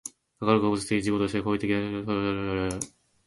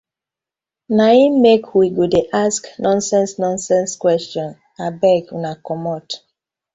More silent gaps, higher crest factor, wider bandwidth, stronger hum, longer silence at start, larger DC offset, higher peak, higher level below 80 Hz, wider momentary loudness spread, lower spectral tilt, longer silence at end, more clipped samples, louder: neither; about the same, 20 dB vs 16 dB; first, 12 kHz vs 8.2 kHz; neither; second, 0.05 s vs 0.9 s; neither; second, -8 dBFS vs -2 dBFS; about the same, -52 dBFS vs -56 dBFS; second, 8 LU vs 15 LU; about the same, -5.5 dB/octave vs -5 dB/octave; second, 0.4 s vs 0.6 s; neither; second, -27 LUFS vs -16 LUFS